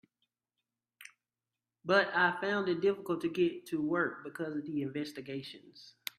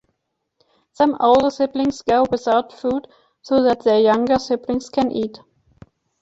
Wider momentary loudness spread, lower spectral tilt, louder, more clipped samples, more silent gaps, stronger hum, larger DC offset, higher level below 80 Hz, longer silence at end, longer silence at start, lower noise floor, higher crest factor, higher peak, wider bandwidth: first, 14 LU vs 9 LU; about the same, -5.5 dB/octave vs -5.5 dB/octave; second, -33 LUFS vs -19 LUFS; neither; neither; neither; neither; second, -78 dBFS vs -52 dBFS; second, 0.3 s vs 0.9 s; about the same, 1 s vs 1 s; first, under -90 dBFS vs -75 dBFS; first, 22 dB vs 16 dB; second, -12 dBFS vs -4 dBFS; first, 15 kHz vs 8 kHz